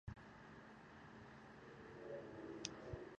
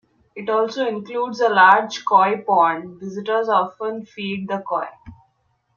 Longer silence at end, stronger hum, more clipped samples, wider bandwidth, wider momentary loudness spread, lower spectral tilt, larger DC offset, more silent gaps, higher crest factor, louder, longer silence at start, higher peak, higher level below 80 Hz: second, 0 s vs 0.65 s; neither; neither; first, 8.4 kHz vs 7.2 kHz; second, 10 LU vs 16 LU; about the same, -4.5 dB/octave vs -4.5 dB/octave; neither; neither; first, 34 dB vs 20 dB; second, -55 LUFS vs -19 LUFS; second, 0.05 s vs 0.35 s; second, -22 dBFS vs 0 dBFS; about the same, -68 dBFS vs -64 dBFS